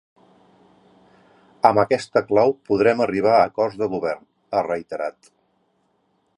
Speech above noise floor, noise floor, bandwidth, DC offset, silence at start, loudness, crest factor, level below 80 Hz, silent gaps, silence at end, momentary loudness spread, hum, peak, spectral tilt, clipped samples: 47 dB; -67 dBFS; 11 kHz; under 0.1%; 1.65 s; -20 LUFS; 22 dB; -60 dBFS; none; 1.25 s; 11 LU; none; 0 dBFS; -6.5 dB/octave; under 0.1%